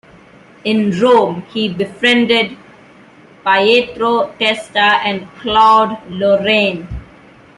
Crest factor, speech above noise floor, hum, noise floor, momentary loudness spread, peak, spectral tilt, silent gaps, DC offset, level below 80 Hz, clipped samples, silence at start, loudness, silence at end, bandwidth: 14 dB; 29 dB; none; -43 dBFS; 11 LU; 0 dBFS; -5 dB/octave; none; under 0.1%; -44 dBFS; under 0.1%; 0.65 s; -13 LUFS; 0.55 s; 11.5 kHz